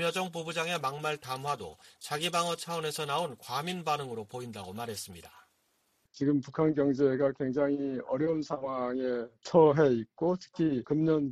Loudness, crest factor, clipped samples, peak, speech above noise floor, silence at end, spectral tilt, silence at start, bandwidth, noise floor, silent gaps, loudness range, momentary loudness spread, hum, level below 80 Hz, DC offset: -31 LUFS; 20 dB; under 0.1%; -12 dBFS; 43 dB; 0 s; -5.5 dB/octave; 0 s; 14 kHz; -74 dBFS; none; 7 LU; 12 LU; none; -68 dBFS; under 0.1%